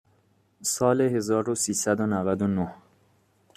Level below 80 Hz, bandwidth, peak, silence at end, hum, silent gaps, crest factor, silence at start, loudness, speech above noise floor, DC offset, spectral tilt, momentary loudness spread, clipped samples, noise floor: -64 dBFS; 14.5 kHz; -8 dBFS; 0.8 s; none; none; 20 dB; 0.6 s; -25 LUFS; 40 dB; under 0.1%; -5 dB/octave; 7 LU; under 0.1%; -65 dBFS